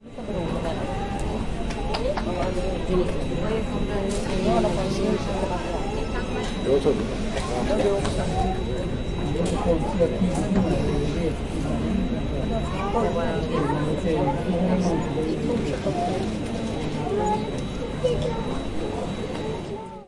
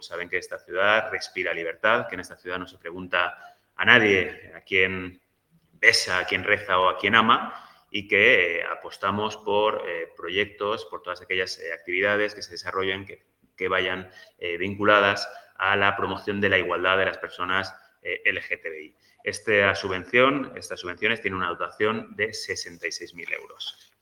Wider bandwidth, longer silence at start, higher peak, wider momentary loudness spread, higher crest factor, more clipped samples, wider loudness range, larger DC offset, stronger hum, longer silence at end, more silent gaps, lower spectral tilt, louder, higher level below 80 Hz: second, 11.5 kHz vs 17.5 kHz; about the same, 0 s vs 0 s; second, -8 dBFS vs 0 dBFS; second, 7 LU vs 16 LU; second, 16 dB vs 26 dB; neither; second, 3 LU vs 6 LU; neither; neither; second, 0 s vs 0.3 s; neither; first, -6.5 dB/octave vs -3.5 dB/octave; about the same, -26 LUFS vs -24 LUFS; first, -32 dBFS vs -64 dBFS